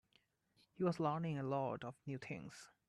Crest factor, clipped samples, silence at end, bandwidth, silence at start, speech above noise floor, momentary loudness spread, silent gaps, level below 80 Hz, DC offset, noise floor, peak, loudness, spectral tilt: 18 dB; under 0.1%; 0.2 s; 12 kHz; 0.8 s; 36 dB; 11 LU; none; -80 dBFS; under 0.1%; -78 dBFS; -26 dBFS; -42 LUFS; -7.5 dB/octave